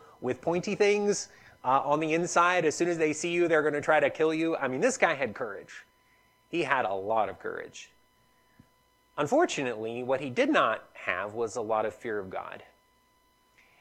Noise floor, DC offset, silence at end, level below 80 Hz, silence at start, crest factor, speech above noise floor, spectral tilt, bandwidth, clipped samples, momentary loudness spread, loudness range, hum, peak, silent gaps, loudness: -67 dBFS; under 0.1%; 1.15 s; -72 dBFS; 0.2 s; 22 dB; 39 dB; -4 dB/octave; 12.5 kHz; under 0.1%; 14 LU; 7 LU; none; -8 dBFS; none; -28 LUFS